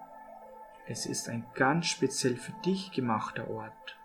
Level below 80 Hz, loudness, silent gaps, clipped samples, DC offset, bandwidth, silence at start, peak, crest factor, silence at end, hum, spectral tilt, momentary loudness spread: -68 dBFS; -32 LUFS; none; under 0.1%; under 0.1%; 18 kHz; 0 s; -12 dBFS; 22 dB; 0 s; none; -4 dB/octave; 21 LU